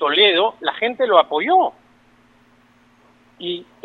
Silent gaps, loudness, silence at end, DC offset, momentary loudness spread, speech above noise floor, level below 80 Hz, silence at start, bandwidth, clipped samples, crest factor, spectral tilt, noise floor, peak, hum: none; -17 LUFS; 0.2 s; under 0.1%; 15 LU; 37 dB; -68 dBFS; 0 s; 4.7 kHz; under 0.1%; 20 dB; -5 dB/octave; -54 dBFS; 0 dBFS; 60 Hz at -60 dBFS